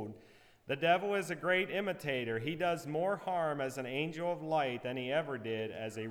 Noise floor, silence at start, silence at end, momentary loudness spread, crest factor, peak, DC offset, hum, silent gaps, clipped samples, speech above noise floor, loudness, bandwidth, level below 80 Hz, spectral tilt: -61 dBFS; 0 s; 0 s; 7 LU; 18 dB; -18 dBFS; under 0.1%; none; none; under 0.1%; 26 dB; -35 LUFS; 19.5 kHz; -74 dBFS; -5.5 dB/octave